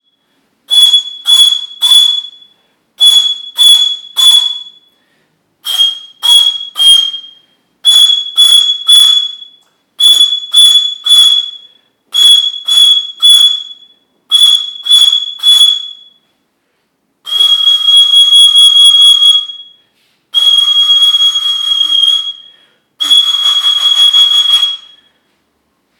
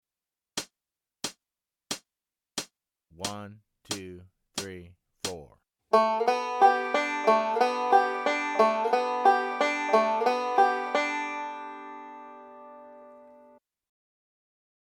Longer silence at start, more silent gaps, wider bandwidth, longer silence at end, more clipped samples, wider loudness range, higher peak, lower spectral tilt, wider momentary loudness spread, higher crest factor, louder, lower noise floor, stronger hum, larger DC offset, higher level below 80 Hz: first, 0.7 s vs 0.55 s; neither; first, 19.5 kHz vs 17.5 kHz; second, 1.2 s vs 1.75 s; first, 0.3% vs under 0.1%; second, 4 LU vs 15 LU; first, 0 dBFS vs -8 dBFS; second, 5 dB/octave vs -3 dB/octave; second, 11 LU vs 21 LU; second, 10 dB vs 20 dB; first, -5 LUFS vs -27 LUFS; second, -61 dBFS vs under -90 dBFS; neither; neither; first, -58 dBFS vs -72 dBFS